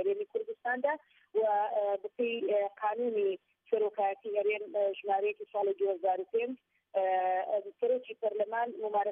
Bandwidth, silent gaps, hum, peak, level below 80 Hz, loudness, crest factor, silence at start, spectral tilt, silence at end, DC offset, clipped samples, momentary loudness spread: 3.7 kHz; none; none; -18 dBFS; under -90 dBFS; -33 LUFS; 14 dB; 0 s; -1.5 dB/octave; 0 s; under 0.1%; under 0.1%; 5 LU